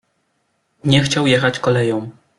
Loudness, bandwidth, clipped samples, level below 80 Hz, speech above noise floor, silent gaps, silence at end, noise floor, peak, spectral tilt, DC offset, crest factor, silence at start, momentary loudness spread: -16 LUFS; 11.5 kHz; under 0.1%; -52 dBFS; 51 dB; none; 0.3 s; -67 dBFS; -2 dBFS; -5 dB/octave; under 0.1%; 16 dB; 0.85 s; 9 LU